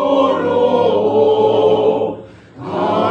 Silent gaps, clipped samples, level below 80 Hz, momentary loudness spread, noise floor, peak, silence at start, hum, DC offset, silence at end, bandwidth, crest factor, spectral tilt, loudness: none; under 0.1%; -58 dBFS; 11 LU; -34 dBFS; -2 dBFS; 0 s; none; under 0.1%; 0 s; 7.2 kHz; 14 dB; -7.5 dB/octave; -14 LUFS